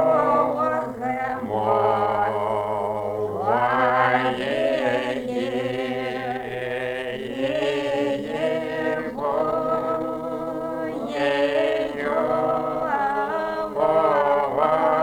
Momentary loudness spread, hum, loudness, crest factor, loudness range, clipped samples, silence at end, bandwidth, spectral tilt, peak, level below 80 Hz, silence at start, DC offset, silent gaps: 8 LU; none; -23 LUFS; 18 dB; 4 LU; under 0.1%; 0 s; 17 kHz; -6 dB/octave; -6 dBFS; -56 dBFS; 0 s; under 0.1%; none